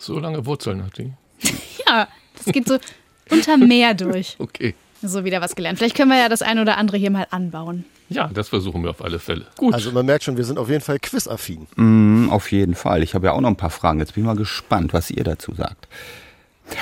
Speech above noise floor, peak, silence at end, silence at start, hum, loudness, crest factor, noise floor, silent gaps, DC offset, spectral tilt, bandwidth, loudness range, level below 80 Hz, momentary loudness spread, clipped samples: 21 dB; 0 dBFS; 0 s; 0 s; none; -19 LUFS; 18 dB; -40 dBFS; none; under 0.1%; -5 dB/octave; 17 kHz; 5 LU; -44 dBFS; 15 LU; under 0.1%